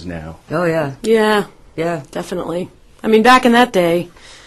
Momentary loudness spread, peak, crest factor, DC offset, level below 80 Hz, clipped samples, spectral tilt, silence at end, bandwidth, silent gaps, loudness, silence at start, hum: 19 LU; 0 dBFS; 16 dB; under 0.1%; -46 dBFS; under 0.1%; -5 dB/octave; 0.15 s; 14 kHz; none; -15 LUFS; 0 s; none